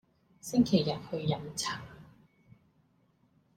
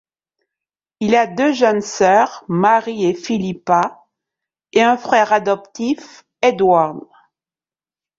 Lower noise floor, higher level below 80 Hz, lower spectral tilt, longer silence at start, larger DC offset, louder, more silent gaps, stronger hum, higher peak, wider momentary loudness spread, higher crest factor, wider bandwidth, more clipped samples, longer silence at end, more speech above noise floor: second, -69 dBFS vs under -90 dBFS; about the same, -64 dBFS vs -60 dBFS; about the same, -5.5 dB/octave vs -5 dB/octave; second, 0.45 s vs 1 s; neither; second, -31 LUFS vs -16 LUFS; neither; neither; second, -14 dBFS vs -2 dBFS; first, 17 LU vs 8 LU; about the same, 20 dB vs 16 dB; first, 16 kHz vs 7.8 kHz; neither; first, 1.5 s vs 1.2 s; second, 39 dB vs over 74 dB